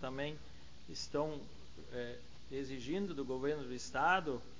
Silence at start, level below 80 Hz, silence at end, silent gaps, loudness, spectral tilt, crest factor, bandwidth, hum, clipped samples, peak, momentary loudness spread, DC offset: 0 s; -60 dBFS; 0 s; none; -40 LUFS; -4.5 dB/octave; 20 dB; 7.6 kHz; none; under 0.1%; -20 dBFS; 21 LU; 0.4%